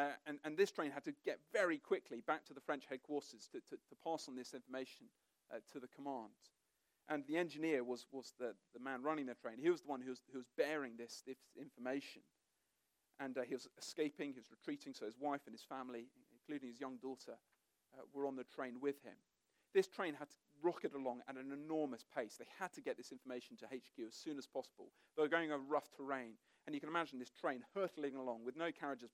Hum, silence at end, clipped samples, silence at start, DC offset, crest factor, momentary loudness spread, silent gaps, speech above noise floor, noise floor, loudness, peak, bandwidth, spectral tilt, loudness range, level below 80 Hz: none; 0.05 s; under 0.1%; 0 s; under 0.1%; 24 dB; 15 LU; none; 41 dB; -86 dBFS; -45 LUFS; -22 dBFS; 16 kHz; -4.5 dB/octave; 7 LU; under -90 dBFS